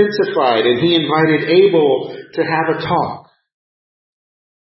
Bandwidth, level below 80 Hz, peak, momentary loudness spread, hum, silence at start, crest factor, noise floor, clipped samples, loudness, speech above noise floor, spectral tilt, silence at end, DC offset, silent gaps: 5.8 kHz; -56 dBFS; -2 dBFS; 10 LU; none; 0 s; 14 dB; under -90 dBFS; under 0.1%; -15 LUFS; over 76 dB; -9.5 dB/octave; 1.55 s; under 0.1%; none